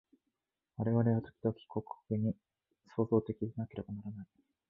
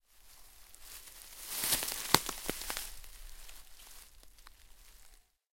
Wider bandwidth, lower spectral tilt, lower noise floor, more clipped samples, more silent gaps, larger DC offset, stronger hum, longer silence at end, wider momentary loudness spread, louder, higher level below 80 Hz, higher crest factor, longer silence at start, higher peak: second, 3.9 kHz vs 17 kHz; first, -11.5 dB/octave vs -1 dB/octave; first, -87 dBFS vs -60 dBFS; neither; neither; neither; neither; about the same, 0.45 s vs 0.35 s; second, 16 LU vs 26 LU; second, -36 LUFS vs -33 LUFS; second, -64 dBFS vs -56 dBFS; second, 20 dB vs 38 dB; first, 0.8 s vs 0.15 s; second, -16 dBFS vs -2 dBFS